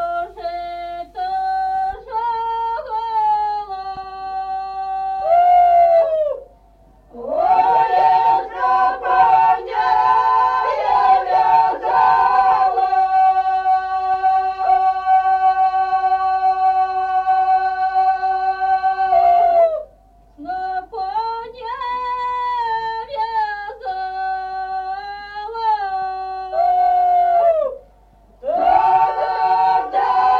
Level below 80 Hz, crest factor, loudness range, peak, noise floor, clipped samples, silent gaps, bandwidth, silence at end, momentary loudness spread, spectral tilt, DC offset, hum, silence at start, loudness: -50 dBFS; 14 dB; 8 LU; -4 dBFS; -49 dBFS; under 0.1%; none; 5.8 kHz; 0 s; 13 LU; -4.5 dB/octave; under 0.1%; none; 0 s; -17 LUFS